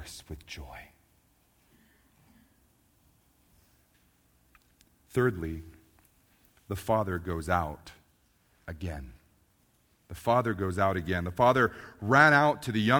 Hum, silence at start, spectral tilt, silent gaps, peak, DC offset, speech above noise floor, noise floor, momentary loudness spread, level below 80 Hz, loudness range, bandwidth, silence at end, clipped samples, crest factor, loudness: none; 0 s; -6 dB/octave; none; -6 dBFS; under 0.1%; 40 dB; -68 dBFS; 23 LU; -52 dBFS; 12 LU; over 20 kHz; 0 s; under 0.1%; 26 dB; -27 LUFS